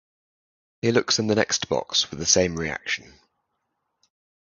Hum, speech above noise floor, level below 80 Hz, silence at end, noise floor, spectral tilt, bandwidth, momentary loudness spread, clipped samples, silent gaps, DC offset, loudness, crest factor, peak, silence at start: none; 54 dB; -52 dBFS; 1.55 s; -77 dBFS; -2.5 dB/octave; 10.5 kHz; 9 LU; under 0.1%; none; under 0.1%; -23 LUFS; 24 dB; -2 dBFS; 0.85 s